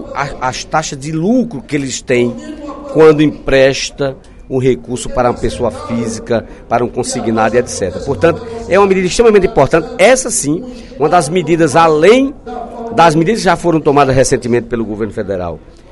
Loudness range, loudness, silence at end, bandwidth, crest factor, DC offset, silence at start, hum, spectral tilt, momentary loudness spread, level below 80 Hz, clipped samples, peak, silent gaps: 5 LU; -12 LUFS; 0.3 s; 12 kHz; 12 dB; under 0.1%; 0 s; none; -5 dB/octave; 11 LU; -34 dBFS; 0.3%; 0 dBFS; none